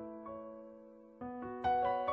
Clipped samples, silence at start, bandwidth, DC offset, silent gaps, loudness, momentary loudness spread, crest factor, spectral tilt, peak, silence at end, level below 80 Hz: under 0.1%; 0 s; 5.8 kHz; under 0.1%; none; -38 LUFS; 22 LU; 16 dB; -7.5 dB/octave; -24 dBFS; 0 s; -66 dBFS